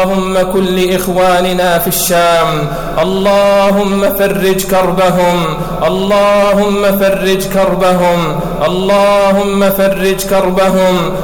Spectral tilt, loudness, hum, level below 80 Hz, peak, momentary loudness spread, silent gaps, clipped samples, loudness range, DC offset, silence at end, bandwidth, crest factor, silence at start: -5 dB/octave; -11 LUFS; none; -30 dBFS; -2 dBFS; 5 LU; none; under 0.1%; 0 LU; under 0.1%; 0 s; 19.5 kHz; 8 dB; 0 s